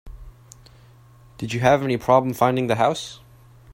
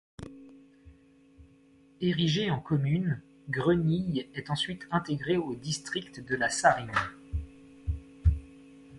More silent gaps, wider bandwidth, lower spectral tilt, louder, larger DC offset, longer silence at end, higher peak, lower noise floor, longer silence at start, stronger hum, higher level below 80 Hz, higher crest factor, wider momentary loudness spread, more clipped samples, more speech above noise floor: neither; first, 16 kHz vs 11.5 kHz; about the same, -6 dB/octave vs -5.5 dB/octave; first, -20 LUFS vs -30 LUFS; neither; about the same, 0 s vs 0 s; first, -2 dBFS vs -8 dBFS; second, -49 dBFS vs -59 dBFS; second, 0.05 s vs 0.2 s; neither; second, -48 dBFS vs -42 dBFS; about the same, 20 dB vs 22 dB; about the same, 13 LU vs 14 LU; neither; about the same, 30 dB vs 30 dB